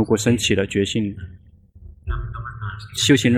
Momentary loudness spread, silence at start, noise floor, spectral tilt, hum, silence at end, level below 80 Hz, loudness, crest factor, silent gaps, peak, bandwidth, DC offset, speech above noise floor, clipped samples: 17 LU; 0 s; -47 dBFS; -4.5 dB/octave; none; 0 s; -36 dBFS; -21 LUFS; 18 dB; none; -4 dBFS; 15 kHz; under 0.1%; 28 dB; under 0.1%